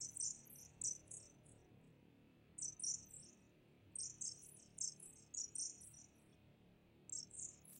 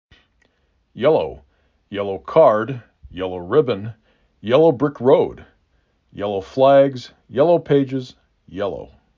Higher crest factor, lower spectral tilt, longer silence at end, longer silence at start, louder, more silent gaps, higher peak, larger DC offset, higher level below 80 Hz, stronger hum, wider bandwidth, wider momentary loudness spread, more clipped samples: about the same, 22 dB vs 18 dB; second, -0.5 dB/octave vs -8 dB/octave; second, 0 s vs 0.3 s; second, 0 s vs 0.95 s; second, -48 LUFS vs -18 LUFS; neither; second, -30 dBFS vs -2 dBFS; neither; second, -80 dBFS vs -52 dBFS; neither; first, 16 kHz vs 7.2 kHz; first, 22 LU vs 19 LU; neither